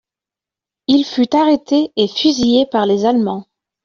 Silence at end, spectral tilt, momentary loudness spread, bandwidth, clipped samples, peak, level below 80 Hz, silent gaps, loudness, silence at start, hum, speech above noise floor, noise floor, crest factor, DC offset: 0.45 s; -5 dB/octave; 5 LU; 7.2 kHz; under 0.1%; -2 dBFS; -52 dBFS; none; -15 LUFS; 0.9 s; none; 74 dB; -88 dBFS; 14 dB; under 0.1%